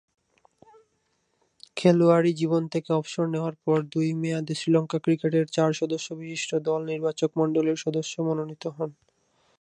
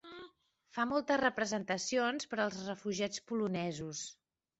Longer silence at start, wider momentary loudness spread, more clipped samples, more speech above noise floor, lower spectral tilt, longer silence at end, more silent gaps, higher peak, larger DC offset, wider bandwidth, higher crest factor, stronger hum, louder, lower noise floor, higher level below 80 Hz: first, 1.75 s vs 0.05 s; about the same, 10 LU vs 12 LU; neither; first, 47 dB vs 29 dB; first, -6.5 dB/octave vs -4 dB/octave; first, 0.7 s vs 0.45 s; neither; first, -6 dBFS vs -18 dBFS; neither; first, 10.5 kHz vs 8.2 kHz; about the same, 20 dB vs 20 dB; neither; first, -26 LUFS vs -36 LUFS; first, -72 dBFS vs -64 dBFS; about the same, -74 dBFS vs -72 dBFS